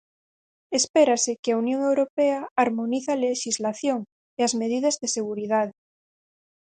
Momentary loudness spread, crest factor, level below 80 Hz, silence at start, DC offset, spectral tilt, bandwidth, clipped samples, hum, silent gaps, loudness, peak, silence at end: 7 LU; 18 dB; -72 dBFS; 0.7 s; under 0.1%; -3 dB/octave; 9.6 kHz; under 0.1%; none; 0.90-0.94 s, 1.39-1.43 s, 2.10-2.17 s, 2.51-2.56 s, 4.12-4.37 s; -24 LUFS; -6 dBFS; 0.95 s